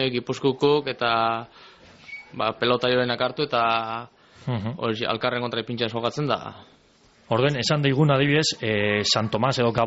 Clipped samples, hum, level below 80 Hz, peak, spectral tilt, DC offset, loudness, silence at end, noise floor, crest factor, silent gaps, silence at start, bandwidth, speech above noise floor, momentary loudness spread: under 0.1%; none; -58 dBFS; -8 dBFS; -3.5 dB/octave; under 0.1%; -23 LUFS; 0 s; -57 dBFS; 16 dB; none; 0 s; 8 kHz; 34 dB; 11 LU